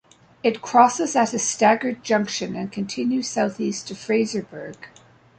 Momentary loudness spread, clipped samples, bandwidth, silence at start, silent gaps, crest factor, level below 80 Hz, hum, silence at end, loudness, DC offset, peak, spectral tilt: 13 LU; under 0.1%; 9.2 kHz; 0.45 s; none; 20 dB; -66 dBFS; none; 0.5 s; -22 LUFS; under 0.1%; -2 dBFS; -3.5 dB/octave